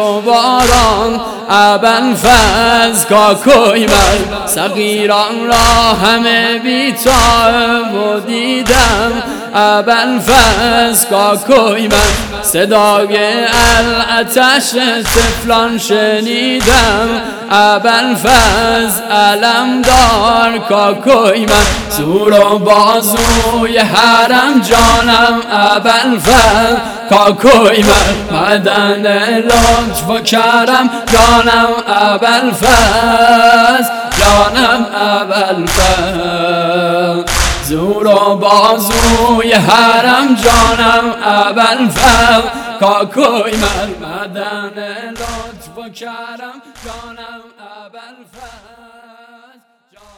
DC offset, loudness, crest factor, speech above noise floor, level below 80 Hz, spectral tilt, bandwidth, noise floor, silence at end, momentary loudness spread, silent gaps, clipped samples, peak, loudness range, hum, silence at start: under 0.1%; -9 LUFS; 10 dB; 40 dB; -24 dBFS; -3 dB/octave; over 20 kHz; -49 dBFS; 1.65 s; 8 LU; none; 1%; 0 dBFS; 4 LU; none; 0 s